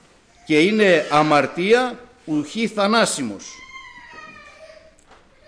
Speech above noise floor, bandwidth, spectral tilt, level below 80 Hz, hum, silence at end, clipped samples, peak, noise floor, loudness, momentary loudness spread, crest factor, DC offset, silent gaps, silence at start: 33 dB; 10.5 kHz; -4 dB/octave; -58 dBFS; none; 0.8 s; under 0.1%; -6 dBFS; -51 dBFS; -18 LUFS; 24 LU; 16 dB; under 0.1%; none; 0.5 s